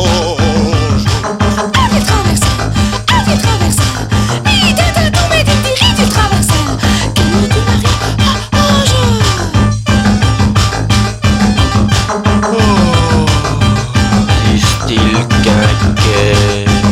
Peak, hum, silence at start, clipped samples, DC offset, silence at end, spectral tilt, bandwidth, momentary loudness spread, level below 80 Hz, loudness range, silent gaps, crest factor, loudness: 0 dBFS; none; 0 s; under 0.1%; under 0.1%; 0 s; -5 dB/octave; 16 kHz; 3 LU; -20 dBFS; 1 LU; none; 10 dB; -10 LUFS